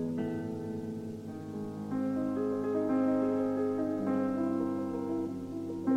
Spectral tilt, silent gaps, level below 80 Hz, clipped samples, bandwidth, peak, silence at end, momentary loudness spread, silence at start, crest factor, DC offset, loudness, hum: -8.5 dB/octave; none; -68 dBFS; under 0.1%; 9.6 kHz; -20 dBFS; 0 s; 10 LU; 0 s; 12 dB; under 0.1%; -33 LUFS; 50 Hz at -50 dBFS